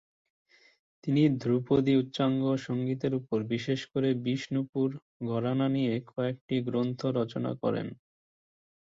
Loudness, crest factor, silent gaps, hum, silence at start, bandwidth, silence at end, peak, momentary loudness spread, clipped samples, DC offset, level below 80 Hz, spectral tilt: -30 LUFS; 16 dB; 4.69-4.73 s, 5.02-5.20 s, 6.41-6.48 s; none; 1.05 s; 7.6 kHz; 0.95 s; -12 dBFS; 7 LU; under 0.1%; under 0.1%; -66 dBFS; -8 dB/octave